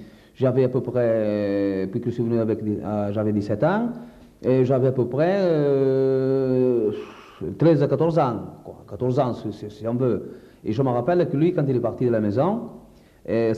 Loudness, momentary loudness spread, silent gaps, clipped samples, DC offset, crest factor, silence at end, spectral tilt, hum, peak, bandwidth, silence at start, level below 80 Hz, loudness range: -22 LUFS; 13 LU; none; under 0.1%; under 0.1%; 16 dB; 0 s; -9.5 dB/octave; none; -6 dBFS; 7.8 kHz; 0 s; -56 dBFS; 3 LU